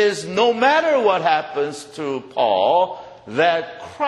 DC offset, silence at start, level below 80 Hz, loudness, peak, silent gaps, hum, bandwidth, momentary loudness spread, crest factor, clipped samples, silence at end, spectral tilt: under 0.1%; 0 s; -64 dBFS; -19 LUFS; -2 dBFS; none; none; 12 kHz; 11 LU; 16 dB; under 0.1%; 0 s; -4 dB/octave